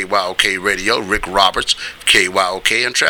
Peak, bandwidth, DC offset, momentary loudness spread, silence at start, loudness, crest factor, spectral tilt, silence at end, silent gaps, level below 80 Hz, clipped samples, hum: 0 dBFS; over 20 kHz; under 0.1%; 5 LU; 0 s; -14 LUFS; 16 dB; -1 dB/octave; 0 s; none; -38 dBFS; under 0.1%; none